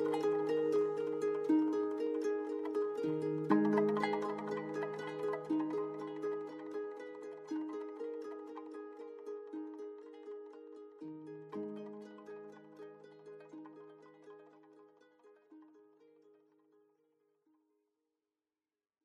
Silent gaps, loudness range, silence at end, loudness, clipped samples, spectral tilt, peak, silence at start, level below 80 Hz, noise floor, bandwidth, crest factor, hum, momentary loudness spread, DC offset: none; 21 LU; 3.2 s; -38 LUFS; under 0.1%; -7.5 dB/octave; -16 dBFS; 0 s; -86 dBFS; under -90 dBFS; 10.5 kHz; 22 dB; none; 21 LU; under 0.1%